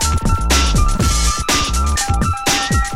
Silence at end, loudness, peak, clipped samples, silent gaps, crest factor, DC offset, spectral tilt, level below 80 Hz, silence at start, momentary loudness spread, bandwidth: 0 s; -16 LUFS; -2 dBFS; under 0.1%; none; 12 dB; under 0.1%; -3 dB/octave; -18 dBFS; 0 s; 3 LU; 16 kHz